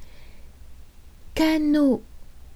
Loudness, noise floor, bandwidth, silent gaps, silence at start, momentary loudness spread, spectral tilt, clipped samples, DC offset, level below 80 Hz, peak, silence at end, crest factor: -22 LUFS; -44 dBFS; 15.5 kHz; none; 0 s; 9 LU; -5 dB/octave; under 0.1%; under 0.1%; -44 dBFS; -8 dBFS; 0 s; 16 dB